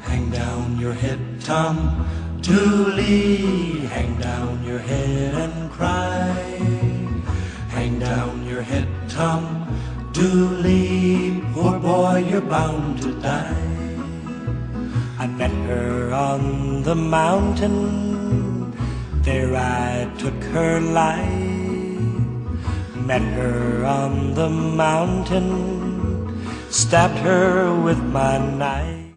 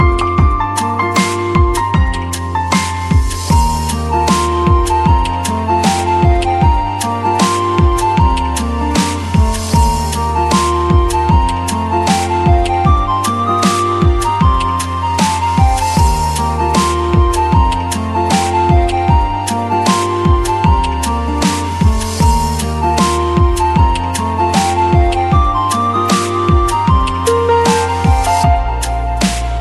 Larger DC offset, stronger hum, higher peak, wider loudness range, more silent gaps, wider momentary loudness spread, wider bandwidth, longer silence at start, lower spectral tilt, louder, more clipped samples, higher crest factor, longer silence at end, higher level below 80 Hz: neither; neither; about the same, -2 dBFS vs 0 dBFS; first, 4 LU vs 1 LU; neither; first, 9 LU vs 4 LU; second, 10.5 kHz vs 13 kHz; about the same, 0 s vs 0 s; about the same, -6 dB/octave vs -5.5 dB/octave; second, -21 LUFS vs -13 LUFS; neither; first, 18 dB vs 12 dB; about the same, 0.05 s vs 0 s; second, -32 dBFS vs -18 dBFS